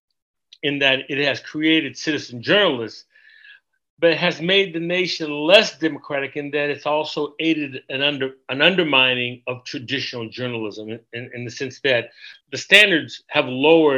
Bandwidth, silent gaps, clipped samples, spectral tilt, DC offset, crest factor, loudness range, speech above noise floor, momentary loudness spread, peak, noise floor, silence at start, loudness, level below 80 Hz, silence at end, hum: 13.5 kHz; 3.90-3.97 s; under 0.1%; -4 dB/octave; under 0.1%; 20 dB; 3 LU; 30 dB; 16 LU; 0 dBFS; -50 dBFS; 0.65 s; -19 LUFS; -70 dBFS; 0 s; none